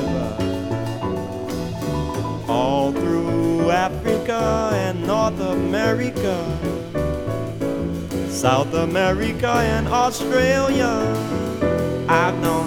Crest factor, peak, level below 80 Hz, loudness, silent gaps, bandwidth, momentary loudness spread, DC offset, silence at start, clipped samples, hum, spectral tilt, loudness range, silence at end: 20 dB; 0 dBFS; -38 dBFS; -21 LUFS; none; 19 kHz; 7 LU; under 0.1%; 0 s; under 0.1%; none; -6 dB/octave; 3 LU; 0 s